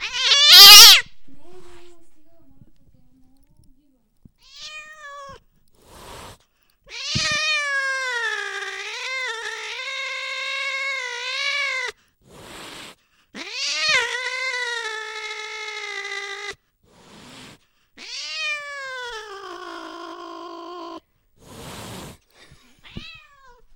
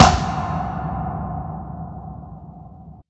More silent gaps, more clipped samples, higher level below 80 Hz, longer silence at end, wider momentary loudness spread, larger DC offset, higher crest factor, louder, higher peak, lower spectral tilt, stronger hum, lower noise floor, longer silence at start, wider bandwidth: neither; first, 0.2% vs under 0.1%; second, -56 dBFS vs -34 dBFS; first, 0.65 s vs 0.1 s; first, 23 LU vs 17 LU; neither; about the same, 22 dB vs 22 dB; first, -13 LUFS vs -24 LUFS; about the same, 0 dBFS vs 0 dBFS; second, 1.5 dB/octave vs -5 dB/octave; neither; first, -62 dBFS vs -41 dBFS; about the same, 0 s vs 0 s; first, 16.5 kHz vs 8.6 kHz